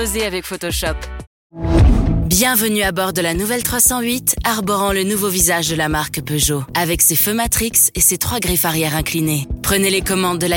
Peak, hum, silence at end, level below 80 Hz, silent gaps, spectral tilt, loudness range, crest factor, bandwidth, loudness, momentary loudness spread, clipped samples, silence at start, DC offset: 0 dBFS; none; 0 s; -26 dBFS; 1.27-1.50 s; -3.5 dB/octave; 2 LU; 16 dB; 17 kHz; -15 LUFS; 8 LU; under 0.1%; 0 s; under 0.1%